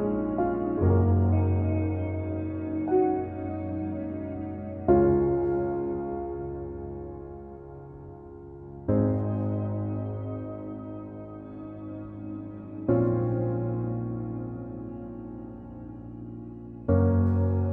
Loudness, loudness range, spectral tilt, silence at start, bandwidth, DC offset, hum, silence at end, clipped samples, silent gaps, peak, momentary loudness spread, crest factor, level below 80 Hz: -28 LUFS; 8 LU; -13.5 dB/octave; 0 s; 2.7 kHz; under 0.1%; none; 0 s; under 0.1%; none; -10 dBFS; 18 LU; 18 dB; -46 dBFS